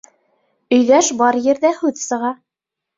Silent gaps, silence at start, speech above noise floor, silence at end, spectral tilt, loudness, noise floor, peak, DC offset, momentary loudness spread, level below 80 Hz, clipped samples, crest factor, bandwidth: none; 0.7 s; 68 dB; 0.65 s; -2.5 dB/octave; -16 LUFS; -83 dBFS; -2 dBFS; under 0.1%; 10 LU; -64 dBFS; under 0.1%; 16 dB; 7.8 kHz